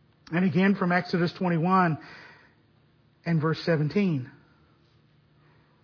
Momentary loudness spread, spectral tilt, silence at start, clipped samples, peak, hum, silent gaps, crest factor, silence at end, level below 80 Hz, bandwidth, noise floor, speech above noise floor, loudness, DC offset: 14 LU; -8.5 dB/octave; 0.3 s; under 0.1%; -12 dBFS; none; none; 16 dB; 1.55 s; -68 dBFS; 5.4 kHz; -62 dBFS; 37 dB; -26 LUFS; under 0.1%